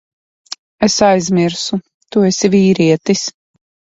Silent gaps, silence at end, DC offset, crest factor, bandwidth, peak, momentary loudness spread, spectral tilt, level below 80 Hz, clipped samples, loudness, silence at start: 0.59-0.78 s, 1.94-2.00 s; 0.65 s; under 0.1%; 14 dB; 8 kHz; 0 dBFS; 13 LU; -5 dB/octave; -50 dBFS; under 0.1%; -14 LUFS; 0.5 s